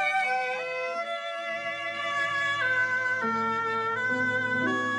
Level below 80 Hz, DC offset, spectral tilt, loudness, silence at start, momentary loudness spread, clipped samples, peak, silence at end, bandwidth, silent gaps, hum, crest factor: -72 dBFS; under 0.1%; -4 dB/octave; -27 LUFS; 0 s; 7 LU; under 0.1%; -16 dBFS; 0 s; 12 kHz; none; none; 12 dB